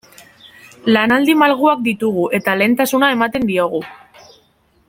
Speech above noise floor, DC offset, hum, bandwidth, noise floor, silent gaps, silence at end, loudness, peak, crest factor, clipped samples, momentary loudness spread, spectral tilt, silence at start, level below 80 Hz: 42 dB; under 0.1%; none; 17 kHz; -56 dBFS; none; 0.95 s; -15 LUFS; -2 dBFS; 16 dB; under 0.1%; 8 LU; -4.5 dB/octave; 0.85 s; -56 dBFS